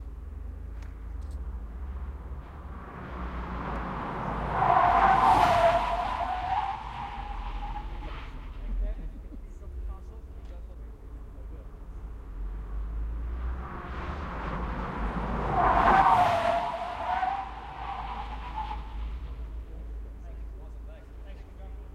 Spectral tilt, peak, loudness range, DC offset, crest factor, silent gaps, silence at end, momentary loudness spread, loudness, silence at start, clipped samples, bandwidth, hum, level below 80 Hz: -6 dB/octave; -8 dBFS; 17 LU; under 0.1%; 22 dB; none; 0 s; 23 LU; -29 LUFS; 0 s; under 0.1%; 13 kHz; none; -38 dBFS